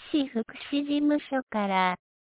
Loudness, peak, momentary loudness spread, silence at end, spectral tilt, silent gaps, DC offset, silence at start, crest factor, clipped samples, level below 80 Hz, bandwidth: -28 LUFS; -12 dBFS; 6 LU; 0.25 s; -3.5 dB/octave; 1.43-1.47 s; under 0.1%; 0 s; 16 dB; under 0.1%; -68 dBFS; 4 kHz